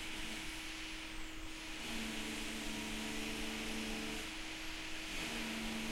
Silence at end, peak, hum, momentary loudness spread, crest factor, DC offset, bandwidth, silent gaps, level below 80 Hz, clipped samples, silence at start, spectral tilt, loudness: 0 s; -28 dBFS; none; 5 LU; 14 dB; under 0.1%; 16 kHz; none; -52 dBFS; under 0.1%; 0 s; -2.5 dB/octave; -42 LUFS